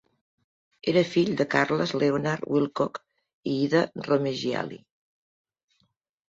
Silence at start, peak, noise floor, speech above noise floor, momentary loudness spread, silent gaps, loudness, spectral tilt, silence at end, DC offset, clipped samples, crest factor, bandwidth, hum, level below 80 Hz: 0.85 s; -6 dBFS; -72 dBFS; 47 dB; 9 LU; 3.33-3.43 s; -26 LUFS; -6 dB/octave; 1.5 s; under 0.1%; under 0.1%; 20 dB; 7.8 kHz; none; -66 dBFS